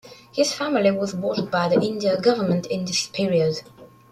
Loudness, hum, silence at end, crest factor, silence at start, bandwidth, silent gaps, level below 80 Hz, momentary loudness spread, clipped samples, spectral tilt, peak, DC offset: -22 LUFS; none; 0.25 s; 18 dB; 0.05 s; 14 kHz; none; -62 dBFS; 5 LU; under 0.1%; -5 dB/octave; -4 dBFS; under 0.1%